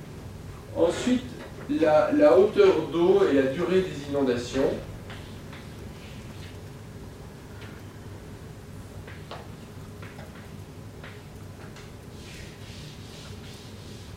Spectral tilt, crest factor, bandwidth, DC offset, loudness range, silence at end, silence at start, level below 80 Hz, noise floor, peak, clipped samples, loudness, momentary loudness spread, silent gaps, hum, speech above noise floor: -6 dB/octave; 20 dB; 16 kHz; under 0.1%; 20 LU; 0 s; 0 s; -50 dBFS; -42 dBFS; -8 dBFS; under 0.1%; -23 LUFS; 22 LU; none; none; 21 dB